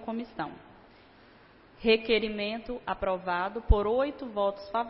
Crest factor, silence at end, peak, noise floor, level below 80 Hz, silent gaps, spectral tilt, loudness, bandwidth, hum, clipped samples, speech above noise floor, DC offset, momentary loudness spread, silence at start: 20 dB; 0 s; -10 dBFS; -56 dBFS; -36 dBFS; none; -9.5 dB/octave; -30 LUFS; 5.8 kHz; none; under 0.1%; 27 dB; under 0.1%; 11 LU; 0 s